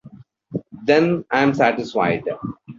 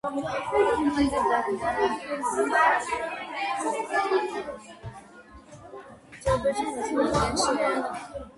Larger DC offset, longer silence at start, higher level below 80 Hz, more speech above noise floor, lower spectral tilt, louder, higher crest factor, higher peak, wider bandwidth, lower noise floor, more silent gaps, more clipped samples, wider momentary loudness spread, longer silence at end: neither; about the same, 0.05 s vs 0.05 s; second, -58 dBFS vs -48 dBFS; first, 27 dB vs 23 dB; first, -7 dB/octave vs -4 dB/octave; first, -19 LUFS vs -26 LUFS; about the same, 18 dB vs 18 dB; first, -2 dBFS vs -8 dBFS; second, 7.6 kHz vs 11.5 kHz; second, -45 dBFS vs -49 dBFS; neither; neither; second, 15 LU vs 19 LU; about the same, 0.05 s vs 0.05 s